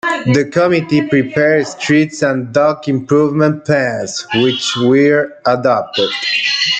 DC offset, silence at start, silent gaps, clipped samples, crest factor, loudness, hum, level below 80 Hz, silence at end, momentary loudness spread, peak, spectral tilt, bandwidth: under 0.1%; 0.05 s; none; under 0.1%; 12 dB; -13 LUFS; none; -56 dBFS; 0 s; 4 LU; -2 dBFS; -5 dB/octave; 9.2 kHz